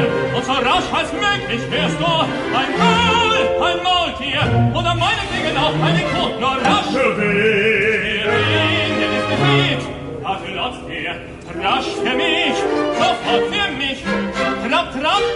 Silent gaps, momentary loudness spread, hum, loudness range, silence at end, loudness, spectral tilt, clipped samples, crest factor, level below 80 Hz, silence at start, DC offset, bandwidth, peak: none; 8 LU; none; 4 LU; 0 s; -17 LUFS; -5 dB/octave; under 0.1%; 16 dB; -40 dBFS; 0 s; under 0.1%; 11.5 kHz; -2 dBFS